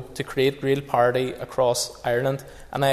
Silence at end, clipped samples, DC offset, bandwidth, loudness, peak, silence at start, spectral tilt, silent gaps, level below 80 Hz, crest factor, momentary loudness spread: 0 s; under 0.1%; under 0.1%; 14 kHz; -24 LUFS; -6 dBFS; 0 s; -4.5 dB/octave; none; -50 dBFS; 16 dB; 8 LU